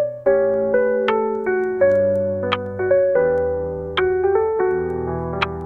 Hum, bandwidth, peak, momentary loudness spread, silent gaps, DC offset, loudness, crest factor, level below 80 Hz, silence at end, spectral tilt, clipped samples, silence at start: none; 5.8 kHz; -4 dBFS; 7 LU; none; 0.1%; -19 LUFS; 16 dB; -48 dBFS; 0 s; -8 dB/octave; under 0.1%; 0 s